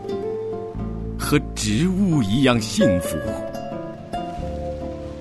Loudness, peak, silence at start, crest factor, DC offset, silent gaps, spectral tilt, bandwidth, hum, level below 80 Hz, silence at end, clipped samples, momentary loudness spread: -23 LUFS; -4 dBFS; 0 s; 18 dB; under 0.1%; none; -5.5 dB/octave; 12.5 kHz; none; -36 dBFS; 0 s; under 0.1%; 12 LU